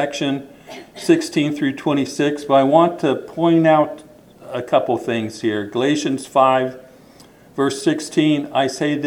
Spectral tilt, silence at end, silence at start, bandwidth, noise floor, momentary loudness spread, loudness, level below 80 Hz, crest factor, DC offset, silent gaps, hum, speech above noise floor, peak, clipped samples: -5.5 dB/octave; 0 s; 0 s; 14.5 kHz; -46 dBFS; 12 LU; -18 LUFS; -62 dBFS; 18 dB; under 0.1%; none; none; 28 dB; 0 dBFS; under 0.1%